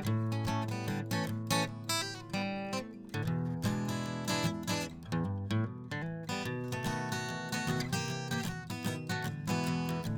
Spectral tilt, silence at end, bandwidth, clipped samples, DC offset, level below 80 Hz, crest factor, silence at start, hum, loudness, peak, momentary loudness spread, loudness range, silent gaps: -5 dB/octave; 0 s; over 20 kHz; under 0.1%; under 0.1%; -62 dBFS; 18 dB; 0 s; none; -35 LUFS; -16 dBFS; 5 LU; 1 LU; none